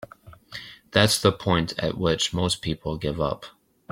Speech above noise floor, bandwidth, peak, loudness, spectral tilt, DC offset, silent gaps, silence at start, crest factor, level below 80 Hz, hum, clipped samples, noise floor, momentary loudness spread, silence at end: 24 dB; 16.5 kHz; -2 dBFS; -24 LUFS; -4 dB/octave; under 0.1%; none; 0 s; 24 dB; -48 dBFS; none; under 0.1%; -48 dBFS; 19 LU; 0.45 s